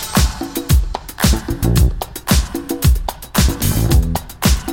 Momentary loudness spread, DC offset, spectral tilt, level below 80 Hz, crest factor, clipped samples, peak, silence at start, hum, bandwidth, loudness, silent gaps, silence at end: 7 LU; under 0.1%; -4.5 dB/octave; -18 dBFS; 14 dB; under 0.1%; 0 dBFS; 0 s; none; 17 kHz; -17 LUFS; none; 0 s